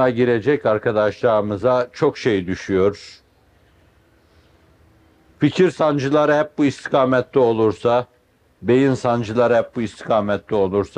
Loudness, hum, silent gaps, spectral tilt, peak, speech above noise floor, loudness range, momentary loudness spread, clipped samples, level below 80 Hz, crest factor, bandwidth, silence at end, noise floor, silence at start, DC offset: -19 LUFS; none; none; -7 dB/octave; -4 dBFS; 38 dB; 6 LU; 5 LU; under 0.1%; -56 dBFS; 16 dB; 10 kHz; 0.1 s; -56 dBFS; 0 s; under 0.1%